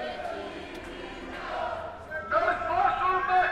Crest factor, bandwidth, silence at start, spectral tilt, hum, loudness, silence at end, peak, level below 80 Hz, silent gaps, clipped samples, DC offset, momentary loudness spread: 16 dB; 11 kHz; 0 s; -5 dB/octave; none; -29 LUFS; 0 s; -12 dBFS; -52 dBFS; none; under 0.1%; under 0.1%; 15 LU